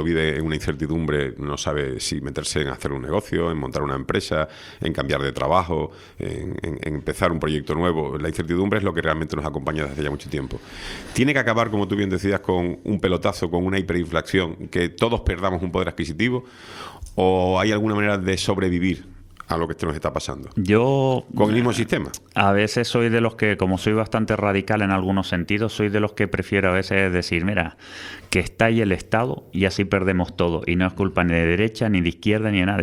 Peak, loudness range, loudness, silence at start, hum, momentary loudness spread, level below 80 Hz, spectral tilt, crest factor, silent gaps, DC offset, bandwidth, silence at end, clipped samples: 0 dBFS; 4 LU; -22 LUFS; 0 s; none; 9 LU; -42 dBFS; -6 dB/octave; 22 dB; none; under 0.1%; 15 kHz; 0 s; under 0.1%